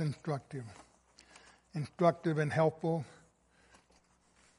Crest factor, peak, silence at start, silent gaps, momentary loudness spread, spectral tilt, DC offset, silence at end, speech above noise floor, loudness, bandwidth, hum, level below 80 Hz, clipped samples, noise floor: 24 dB; -14 dBFS; 0 s; none; 16 LU; -7.5 dB/octave; under 0.1%; 1.45 s; 35 dB; -34 LUFS; 11.5 kHz; none; -72 dBFS; under 0.1%; -69 dBFS